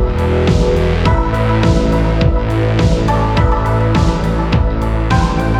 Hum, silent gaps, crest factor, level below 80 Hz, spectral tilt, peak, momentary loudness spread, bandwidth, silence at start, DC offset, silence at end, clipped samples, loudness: none; none; 12 dB; -18 dBFS; -7.5 dB/octave; 0 dBFS; 2 LU; 10.5 kHz; 0 s; under 0.1%; 0 s; under 0.1%; -14 LUFS